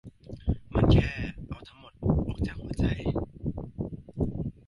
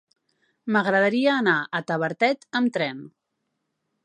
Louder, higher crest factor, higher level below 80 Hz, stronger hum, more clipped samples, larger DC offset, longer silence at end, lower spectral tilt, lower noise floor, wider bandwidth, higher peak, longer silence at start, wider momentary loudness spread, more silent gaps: second, -30 LUFS vs -23 LUFS; about the same, 20 dB vs 18 dB; first, -36 dBFS vs -78 dBFS; neither; neither; neither; second, 0.15 s vs 0.95 s; first, -8.5 dB/octave vs -6 dB/octave; second, -47 dBFS vs -78 dBFS; first, 11.5 kHz vs 9.6 kHz; second, -10 dBFS vs -6 dBFS; second, 0.05 s vs 0.65 s; first, 18 LU vs 9 LU; neither